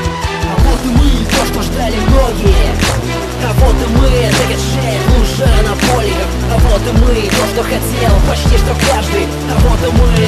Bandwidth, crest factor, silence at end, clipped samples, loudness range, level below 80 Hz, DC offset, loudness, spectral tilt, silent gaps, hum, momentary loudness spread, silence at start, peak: 14 kHz; 10 dB; 0 s; under 0.1%; 1 LU; -14 dBFS; under 0.1%; -12 LUFS; -5 dB/octave; none; none; 4 LU; 0 s; 0 dBFS